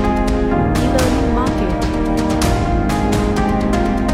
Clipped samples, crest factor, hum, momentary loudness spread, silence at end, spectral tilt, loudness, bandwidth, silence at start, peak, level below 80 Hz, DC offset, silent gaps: under 0.1%; 12 dB; none; 3 LU; 0 s; -6 dB/octave; -17 LUFS; 16 kHz; 0 s; -2 dBFS; -22 dBFS; under 0.1%; none